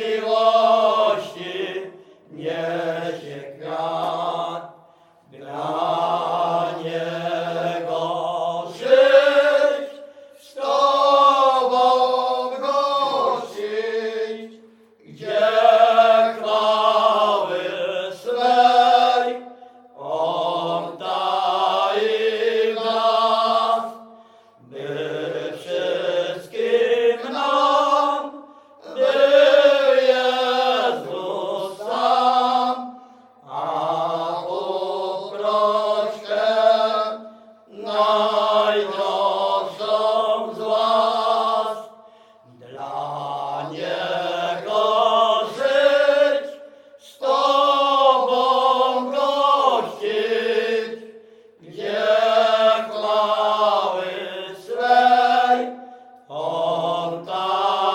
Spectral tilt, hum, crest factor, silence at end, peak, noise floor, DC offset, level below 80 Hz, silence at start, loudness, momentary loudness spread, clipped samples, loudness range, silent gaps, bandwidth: -4 dB/octave; none; 18 dB; 0 s; -2 dBFS; -53 dBFS; under 0.1%; -78 dBFS; 0 s; -19 LUFS; 14 LU; under 0.1%; 7 LU; none; 15 kHz